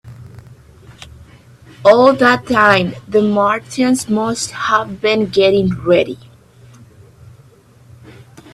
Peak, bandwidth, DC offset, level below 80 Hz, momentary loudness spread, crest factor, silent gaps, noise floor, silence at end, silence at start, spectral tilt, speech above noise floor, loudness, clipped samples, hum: 0 dBFS; 14 kHz; under 0.1%; -48 dBFS; 8 LU; 16 dB; none; -46 dBFS; 2.4 s; 0.05 s; -5 dB/octave; 32 dB; -14 LUFS; under 0.1%; none